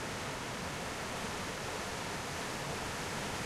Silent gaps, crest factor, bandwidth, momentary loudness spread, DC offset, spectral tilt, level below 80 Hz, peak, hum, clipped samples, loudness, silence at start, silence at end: none; 14 dB; 16.5 kHz; 1 LU; under 0.1%; -3 dB/octave; -56 dBFS; -26 dBFS; none; under 0.1%; -39 LUFS; 0 s; 0 s